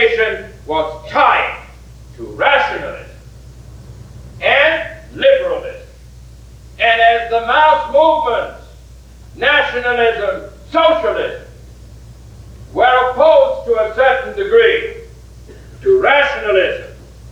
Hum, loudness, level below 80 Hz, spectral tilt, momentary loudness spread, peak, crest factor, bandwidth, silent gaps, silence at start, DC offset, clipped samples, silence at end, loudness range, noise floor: none; -13 LUFS; -40 dBFS; -4.5 dB/octave; 16 LU; 0 dBFS; 16 dB; 10.5 kHz; none; 0 s; under 0.1%; under 0.1%; 0 s; 4 LU; -38 dBFS